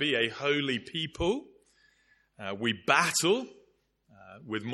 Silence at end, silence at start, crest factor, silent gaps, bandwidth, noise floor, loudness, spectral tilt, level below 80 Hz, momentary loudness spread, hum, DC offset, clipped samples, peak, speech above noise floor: 0 s; 0 s; 24 dB; none; 13 kHz; -68 dBFS; -29 LUFS; -3 dB/octave; -56 dBFS; 15 LU; none; under 0.1%; under 0.1%; -6 dBFS; 38 dB